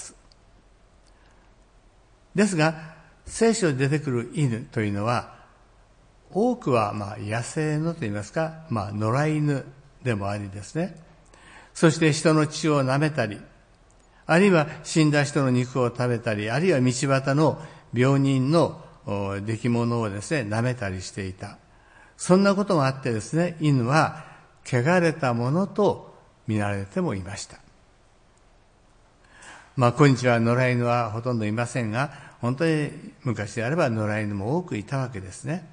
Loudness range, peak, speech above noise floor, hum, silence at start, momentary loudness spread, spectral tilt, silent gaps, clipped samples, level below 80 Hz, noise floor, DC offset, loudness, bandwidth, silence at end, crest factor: 5 LU; -4 dBFS; 34 dB; none; 0 s; 13 LU; -6 dB/octave; none; under 0.1%; -58 dBFS; -57 dBFS; under 0.1%; -24 LUFS; 10.5 kHz; 0.05 s; 20 dB